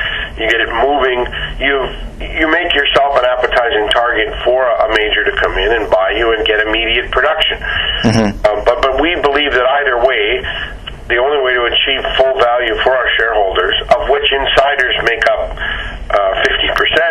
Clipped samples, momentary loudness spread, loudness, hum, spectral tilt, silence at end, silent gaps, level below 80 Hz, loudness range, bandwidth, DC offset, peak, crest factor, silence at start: under 0.1%; 6 LU; -12 LUFS; none; -4.5 dB/octave; 0 s; none; -30 dBFS; 1 LU; 12.5 kHz; under 0.1%; 0 dBFS; 12 dB; 0 s